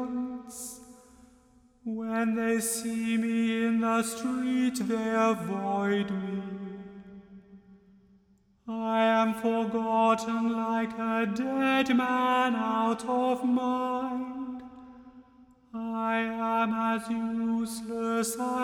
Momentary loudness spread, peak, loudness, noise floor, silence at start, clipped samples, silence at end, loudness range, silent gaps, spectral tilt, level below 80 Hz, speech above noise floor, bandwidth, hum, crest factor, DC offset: 14 LU; -12 dBFS; -28 LUFS; -64 dBFS; 0 s; under 0.1%; 0 s; 5 LU; none; -4.5 dB/octave; -66 dBFS; 37 dB; 16.5 kHz; none; 18 dB; under 0.1%